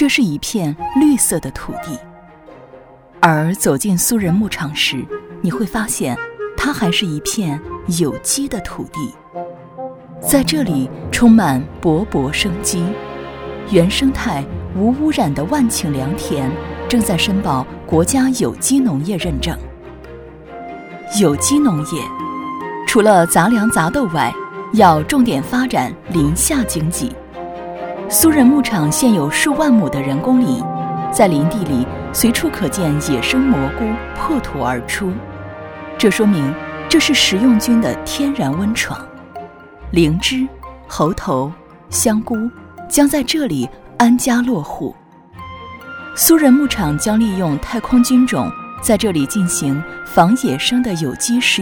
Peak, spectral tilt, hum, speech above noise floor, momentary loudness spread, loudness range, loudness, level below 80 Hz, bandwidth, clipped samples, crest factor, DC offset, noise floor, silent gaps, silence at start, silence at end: 0 dBFS; -4.5 dB/octave; none; 26 dB; 16 LU; 5 LU; -16 LUFS; -36 dBFS; over 20 kHz; under 0.1%; 16 dB; under 0.1%; -41 dBFS; none; 0 s; 0 s